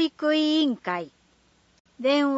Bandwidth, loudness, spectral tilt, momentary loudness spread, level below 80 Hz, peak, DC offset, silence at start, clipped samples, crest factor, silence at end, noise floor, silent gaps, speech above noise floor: 8 kHz; -24 LUFS; -4.5 dB/octave; 10 LU; -72 dBFS; -10 dBFS; under 0.1%; 0 s; under 0.1%; 16 dB; 0 s; -62 dBFS; 1.80-1.85 s; 39 dB